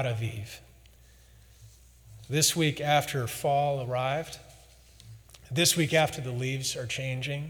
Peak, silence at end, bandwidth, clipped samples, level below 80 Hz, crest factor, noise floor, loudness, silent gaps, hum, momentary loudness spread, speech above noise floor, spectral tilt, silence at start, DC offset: -10 dBFS; 0 s; over 20 kHz; under 0.1%; -58 dBFS; 20 dB; -56 dBFS; -28 LUFS; none; none; 13 LU; 27 dB; -3.5 dB/octave; 0 s; under 0.1%